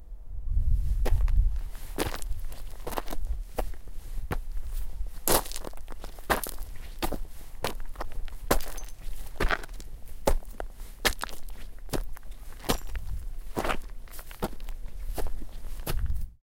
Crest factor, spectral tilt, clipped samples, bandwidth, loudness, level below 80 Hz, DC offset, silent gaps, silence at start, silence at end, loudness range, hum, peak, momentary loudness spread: 24 dB; -4 dB/octave; under 0.1%; 17 kHz; -34 LUFS; -32 dBFS; under 0.1%; none; 0 s; 0.1 s; 5 LU; none; -4 dBFS; 16 LU